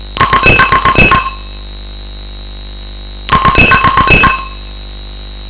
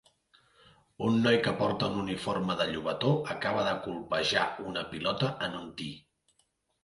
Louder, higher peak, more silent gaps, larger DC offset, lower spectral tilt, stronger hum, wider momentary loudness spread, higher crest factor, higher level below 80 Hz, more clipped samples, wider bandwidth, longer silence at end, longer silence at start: first, -7 LUFS vs -30 LUFS; first, 0 dBFS vs -12 dBFS; neither; neither; first, -9 dB/octave vs -5.5 dB/octave; first, 50 Hz at -25 dBFS vs none; first, 21 LU vs 10 LU; second, 10 dB vs 20 dB; first, -22 dBFS vs -62 dBFS; first, 0.9% vs under 0.1%; second, 4 kHz vs 11.5 kHz; second, 0 s vs 0.85 s; second, 0 s vs 1 s